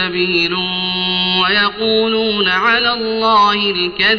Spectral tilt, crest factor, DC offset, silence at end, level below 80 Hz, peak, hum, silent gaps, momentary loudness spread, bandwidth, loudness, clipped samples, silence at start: -0.5 dB/octave; 12 dB; under 0.1%; 0 s; -46 dBFS; -2 dBFS; none; none; 4 LU; 6.6 kHz; -13 LUFS; under 0.1%; 0 s